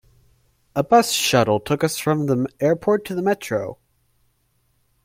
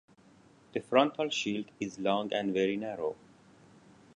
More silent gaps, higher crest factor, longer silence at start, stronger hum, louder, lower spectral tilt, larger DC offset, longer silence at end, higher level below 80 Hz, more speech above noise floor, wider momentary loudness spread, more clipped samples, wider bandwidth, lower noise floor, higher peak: neither; second, 18 dB vs 24 dB; about the same, 0.75 s vs 0.75 s; neither; first, -20 LUFS vs -32 LUFS; about the same, -4.5 dB/octave vs -4.5 dB/octave; neither; first, 1.3 s vs 1 s; first, -56 dBFS vs -74 dBFS; first, 46 dB vs 29 dB; second, 10 LU vs 13 LU; neither; first, 16.5 kHz vs 10.5 kHz; first, -66 dBFS vs -60 dBFS; first, -4 dBFS vs -10 dBFS